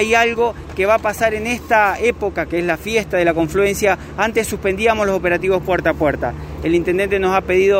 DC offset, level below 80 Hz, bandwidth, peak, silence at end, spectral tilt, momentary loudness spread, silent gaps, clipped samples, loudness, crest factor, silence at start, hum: under 0.1%; -36 dBFS; 16 kHz; -2 dBFS; 0 s; -5 dB/octave; 6 LU; none; under 0.1%; -17 LUFS; 16 dB; 0 s; none